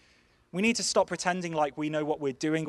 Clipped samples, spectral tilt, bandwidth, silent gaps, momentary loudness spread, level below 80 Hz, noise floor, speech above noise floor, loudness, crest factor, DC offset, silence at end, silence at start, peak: under 0.1%; -4 dB/octave; 12 kHz; none; 5 LU; -66 dBFS; -64 dBFS; 35 dB; -29 LUFS; 20 dB; under 0.1%; 0 s; 0.55 s; -10 dBFS